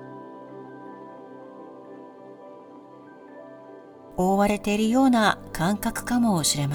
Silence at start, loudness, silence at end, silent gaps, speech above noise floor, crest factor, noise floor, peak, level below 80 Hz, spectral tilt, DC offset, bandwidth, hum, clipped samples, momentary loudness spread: 0 s; -23 LUFS; 0 s; none; 24 dB; 20 dB; -46 dBFS; -6 dBFS; -50 dBFS; -4.5 dB/octave; under 0.1%; over 20 kHz; none; under 0.1%; 25 LU